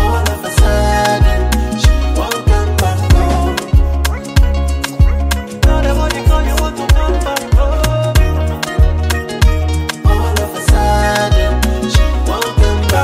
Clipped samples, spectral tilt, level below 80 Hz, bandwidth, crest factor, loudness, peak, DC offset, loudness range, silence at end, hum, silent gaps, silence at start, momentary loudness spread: under 0.1%; -5.5 dB/octave; -14 dBFS; 16 kHz; 12 dB; -14 LUFS; 0 dBFS; under 0.1%; 1 LU; 0 s; none; none; 0 s; 4 LU